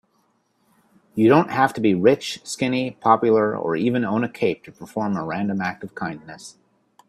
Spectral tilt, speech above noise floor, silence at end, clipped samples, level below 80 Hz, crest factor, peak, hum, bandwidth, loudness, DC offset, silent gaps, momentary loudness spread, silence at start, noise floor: -6 dB/octave; 45 dB; 0.6 s; under 0.1%; -62 dBFS; 20 dB; -2 dBFS; none; 13.5 kHz; -21 LUFS; under 0.1%; none; 16 LU; 1.15 s; -66 dBFS